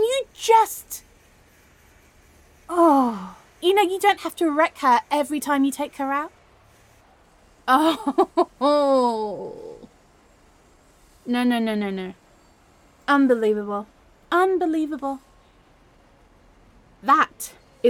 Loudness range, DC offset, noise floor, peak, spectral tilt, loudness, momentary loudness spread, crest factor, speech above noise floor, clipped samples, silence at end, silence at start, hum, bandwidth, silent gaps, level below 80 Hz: 6 LU; under 0.1%; -55 dBFS; -4 dBFS; -4 dB/octave; -21 LUFS; 18 LU; 18 dB; 34 dB; under 0.1%; 0 s; 0 s; none; 17.5 kHz; none; -60 dBFS